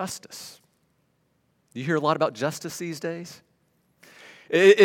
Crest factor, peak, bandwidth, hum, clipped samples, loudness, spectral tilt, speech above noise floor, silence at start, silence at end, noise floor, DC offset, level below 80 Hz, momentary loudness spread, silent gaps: 22 dB; -4 dBFS; 16.5 kHz; none; under 0.1%; -25 LUFS; -4.5 dB/octave; 46 dB; 0 s; 0 s; -69 dBFS; under 0.1%; -78 dBFS; 23 LU; none